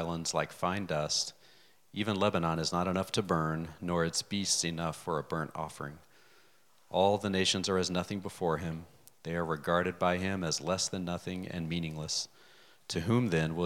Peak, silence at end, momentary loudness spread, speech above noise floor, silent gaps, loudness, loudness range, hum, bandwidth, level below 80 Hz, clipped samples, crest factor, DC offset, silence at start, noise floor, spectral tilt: -12 dBFS; 0 s; 10 LU; 34 dB; none; -32 LUFS; 3 LU; none; 16.5 kHz; -62 dBFS; under 0.1%; 20 dB; under 0.1%; 0 s; -67 dBFS; -4 dB/octave